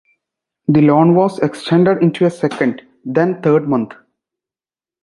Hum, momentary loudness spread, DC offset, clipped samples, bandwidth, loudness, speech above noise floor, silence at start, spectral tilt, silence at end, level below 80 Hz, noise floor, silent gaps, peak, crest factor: none; 9 LU; under 0.1%; under 0.1%; 11.5 kHz; -15 LUFS; over 76 dB; 0.7 s; -8 dB/octave; 1.1 s; -58 dBFS; under -90 dBFS; none; -2 dBFS; 14 dB